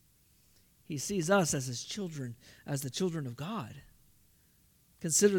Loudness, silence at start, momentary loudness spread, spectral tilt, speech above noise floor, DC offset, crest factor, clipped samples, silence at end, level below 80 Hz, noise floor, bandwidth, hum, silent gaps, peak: -34 LUFS; 0.9 s; 16 LU; -4 dB/octave; 34 dB; under 0.1%; 22 dB; under 0.1%; 0 s; -68 dBFS; -67 dBFS; 18 kHz; none; none; -12 dBFS